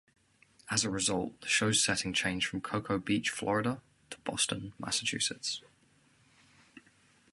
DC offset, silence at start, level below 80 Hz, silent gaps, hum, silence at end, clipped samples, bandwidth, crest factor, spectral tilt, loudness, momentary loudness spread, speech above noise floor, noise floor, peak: under 0.1%; 0.65 s; -62 dBFS; none; none; 0.55 s; under 0.1%; 12 kHz; 22 dB; -2.5 dB/octave; -31 LUFS; 11 LU; 34 dB; -67 dBFS; -14 dBFS